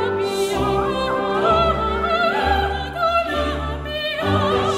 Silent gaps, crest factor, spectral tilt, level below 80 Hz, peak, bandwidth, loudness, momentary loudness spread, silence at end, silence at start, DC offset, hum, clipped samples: none; 14 dB; -5.5 dB/octave; -32 dBFS; -6 dBFS; 15.5 kHz; -20 LUFS; 6 LU; 0 s; 0 s; under 0.1%; none; under 0.1%